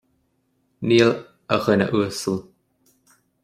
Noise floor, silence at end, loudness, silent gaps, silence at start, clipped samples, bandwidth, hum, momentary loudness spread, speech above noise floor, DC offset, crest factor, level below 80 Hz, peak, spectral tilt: -68 dBFS; 1 s; -21 LUFS; none; 0.8 s; under 0.1%; 15 kHz; none; 13 LU; 49 dB; under 0.1%; 20 dB; -60 dBFS; -2 dBFS; -5.5 dB/octave